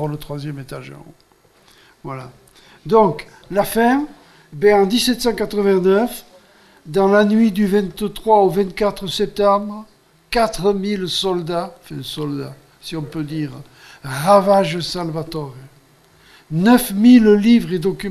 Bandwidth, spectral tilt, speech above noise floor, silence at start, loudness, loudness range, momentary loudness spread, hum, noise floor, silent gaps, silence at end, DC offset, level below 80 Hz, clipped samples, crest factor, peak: 14.5 kHz; -5.5 dB/octave; 35 dB; 0 s; -17 LUFS; 7 LU; 19 LU; none; -52 dBFS; none; 0 s; under 0.1%; -44 dBFS; under 0.1%; 16 dB; 0 dBFS